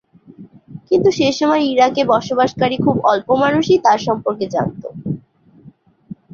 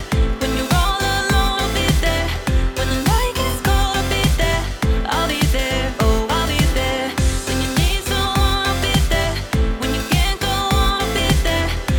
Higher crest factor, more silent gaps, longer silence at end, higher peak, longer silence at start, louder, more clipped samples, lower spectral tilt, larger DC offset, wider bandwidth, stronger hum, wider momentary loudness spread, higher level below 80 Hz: about the same, 16 dB vs 14 dB; neither; first, 0.2 s vs 0 s; about the same, -2 dBFS vs -4 dBFS; first, 0.4 s vs 0 s; about the same, -16 LUFS vs -18 LUFS; neither; about the same, -5.5 dB/octave vs -4.5 dB/octave; neither; second, 7.4 kHz vs over 20 kHz; neither; first, 12 LU vs 3 LU; second, -52 dBFS vs -22 dBFS